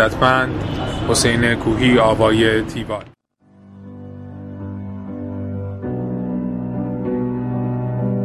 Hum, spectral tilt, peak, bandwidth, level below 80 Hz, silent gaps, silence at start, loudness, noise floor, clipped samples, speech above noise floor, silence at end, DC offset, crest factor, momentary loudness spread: none; -5 dB/octave; 0 dBFS; 14.5 kHz; -38 dBFS; none; 0 s; -19 LUFS; -51 dBFS; under 0.1%; 35 dB; 0 s; under 0.1%; 20 dB; 17 LU